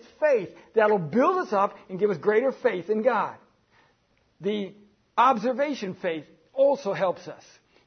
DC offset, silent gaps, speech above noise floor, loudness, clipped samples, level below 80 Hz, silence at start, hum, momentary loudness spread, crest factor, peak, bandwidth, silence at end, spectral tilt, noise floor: under 0.1%; none; 42 dB; -25 LUFS; under 0.1%; -74 dBFS; 0.2 s; none; 11 LU; 18 dB; -8 dBFS; 6.6 kHz; 0.5 s; -6.5 dB/octave; -67 dBFS